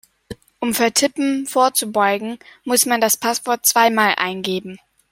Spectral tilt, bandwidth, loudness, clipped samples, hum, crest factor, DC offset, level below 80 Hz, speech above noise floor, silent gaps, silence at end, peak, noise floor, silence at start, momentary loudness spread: -2 dB/octave; 16.5 kHz; -17 LUFS; under 0.1%; none; 20 dB; under 0.1%; -60 dBFS; 20 dB; none; 0.35 s; 0 dBFS; -38 dBFS; 0.3 s; 11 LU